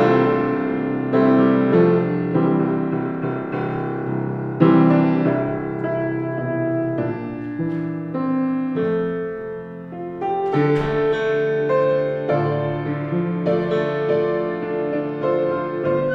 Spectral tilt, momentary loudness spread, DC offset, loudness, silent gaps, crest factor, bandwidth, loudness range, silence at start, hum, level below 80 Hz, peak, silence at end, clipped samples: -9.5 dB/octave; 9 LU; under 0.1%; -20 LUFS; none; 18 dB; 6 kHz; 5 LU; 0 s; none; -52 dBFS; -2 dBFS; 0 s; under 0.1%